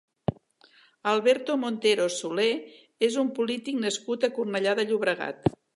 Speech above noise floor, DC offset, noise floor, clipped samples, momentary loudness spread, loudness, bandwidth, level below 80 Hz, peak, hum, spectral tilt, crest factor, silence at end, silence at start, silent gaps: 33 dB; under 0.1%; -59 dBFS; under 0.1%; 7 LU; -27 LUFS; 11.5 kHz; -60 dBFS; -8 dBFS; none; -4.5 dB/octave; 18 dB; 0.25 s; 0.3 s; none